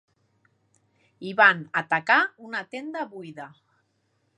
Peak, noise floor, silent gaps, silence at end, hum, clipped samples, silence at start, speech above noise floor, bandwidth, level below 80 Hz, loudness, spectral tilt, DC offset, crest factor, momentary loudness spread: -2 dBFS; -71 dBFS; none; 0.9 s; none; under 0.1%; 1.2 s; 47 dB; 10.5 kHz; -84 dBFS; -23 LUFS; -5 dB/octave; under 0.1%; 24 dB; 22 LU